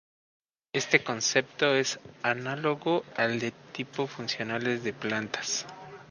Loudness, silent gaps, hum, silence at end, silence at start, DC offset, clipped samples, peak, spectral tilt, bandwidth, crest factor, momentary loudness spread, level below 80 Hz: -29 LUFS; none; none; 0 s; 0.75 s; under 0.1%; under 0.1%; -6 dBFS; -3 dB/octave; 10.5 kHz; 26 dB; 9 LU; -72 dBFS